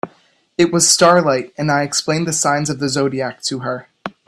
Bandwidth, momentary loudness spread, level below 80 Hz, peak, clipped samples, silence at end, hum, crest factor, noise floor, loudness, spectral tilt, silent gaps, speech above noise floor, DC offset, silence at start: 14.5 kHz; 16 LU; -56 dBFS; 0 dBFS; under 0.1%; 0.2 s; none; 18 dB; -53 dBFS; -16 LUFS; -3.5 dB/octave; none; 37 dB; under 0.1%; 0.05 s